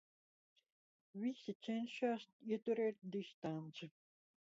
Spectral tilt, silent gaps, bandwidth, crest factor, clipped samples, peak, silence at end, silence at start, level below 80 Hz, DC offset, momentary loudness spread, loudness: -5 dB/octave; 1.55-1.60 s, 2.33-2.39 s, 3.34-3.42 s; 7.6 kHz; 18 dB; under 0.1%; -28 dBFS; 0.7 s; 1.15 s; under -90 dBFS; under 0.1%; 12 LU; -44 LUFS